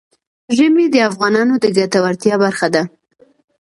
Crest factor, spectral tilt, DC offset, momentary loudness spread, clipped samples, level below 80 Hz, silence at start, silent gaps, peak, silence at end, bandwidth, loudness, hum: 14 dB; -5 dB/octave; under 0.1%; 6 LU; under 0.1%; -62 dBFS; 0.5 s; none; 0 dBFS; 0.75 s; 11.5 kHz; -14 LUFS; none